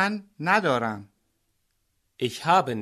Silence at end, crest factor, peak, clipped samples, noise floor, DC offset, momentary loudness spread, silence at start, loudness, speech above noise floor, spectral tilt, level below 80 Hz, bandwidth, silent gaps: 0 s; 20 dB; -6 dBFS; under 0.1%; -73 dBFS; under 0.1%; 10 LU; 0 s; -25 LUFS; 48 dB; -5 dB/octave; -68 dBFS; 13.5 kHz; none